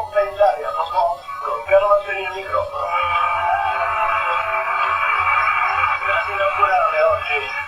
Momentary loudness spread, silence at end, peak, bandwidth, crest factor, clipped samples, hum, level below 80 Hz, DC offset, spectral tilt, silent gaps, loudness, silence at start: 7 LU; 0 s; -2 dBFS; 13.5 kHz; 16 dB; under 0.1%; none; -48 dBFS; under 0.1%; -3.5 dB/octave; none; -18 LUFS; 0 s